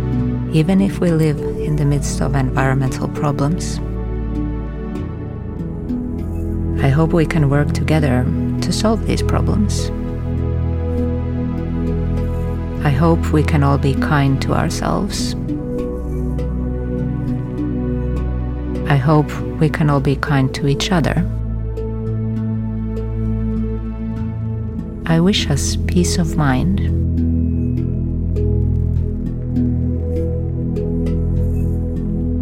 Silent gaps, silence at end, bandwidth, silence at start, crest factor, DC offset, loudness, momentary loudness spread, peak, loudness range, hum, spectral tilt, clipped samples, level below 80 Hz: none; 0 s; 15 kHz; 0 s; 16 dB; under 0.1%; -19 LUFS; 8 LU; -2 dBFS; 5 LU; none; -6.5 dB/octave; under 0.1%; -26 dBFS